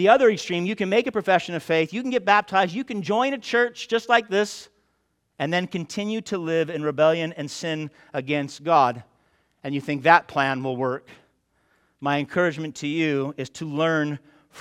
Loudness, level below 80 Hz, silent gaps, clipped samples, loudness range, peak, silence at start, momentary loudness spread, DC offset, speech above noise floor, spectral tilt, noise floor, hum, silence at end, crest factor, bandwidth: -23 LUFS; -68 dBFS; none; under 0.1%; 4 LU; 0 dBFS; 0 s; 12 LU; under 0.1%; 49 dB; -5 dB/octave; -71 dBFS; none; 0 s; 24 dB; 13.5 kHz